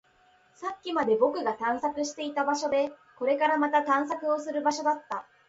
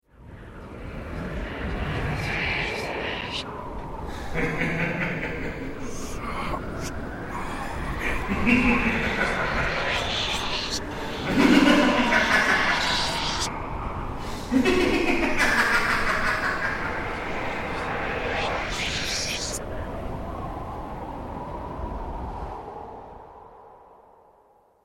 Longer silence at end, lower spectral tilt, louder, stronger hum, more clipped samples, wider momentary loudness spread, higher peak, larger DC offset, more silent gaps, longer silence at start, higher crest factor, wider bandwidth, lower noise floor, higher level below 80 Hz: second, 0.25 s vs 0.9 s; about the same, -3 dB/octave vs -4 dB/octave; second, -28 LUFS vs -25 LUFS; neither; neither; second, 9 LU vs 15 LU; second, -10 dBFS vs -4 dBFS; neither; neither; first, 0.6 s vs 0.2 s; about the same, 18 dB vs 22 dB; second, 8 kHz vs 16 kHz; first, -63 dBFS vs -59 dBFS; second, -72 dBFS vs -38 dBFS